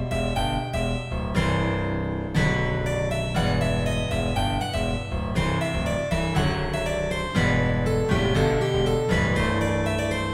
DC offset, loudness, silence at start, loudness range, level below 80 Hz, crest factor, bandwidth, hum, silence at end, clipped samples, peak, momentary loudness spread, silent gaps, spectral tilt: under 0.1%; -24 LUFS; 0 s; 2 LU; -34 dBFS; 16 dB; 16 kHz; none; 0 s; under 0.1%; -8 dBFS; 5 LU; none; -6 dB/octave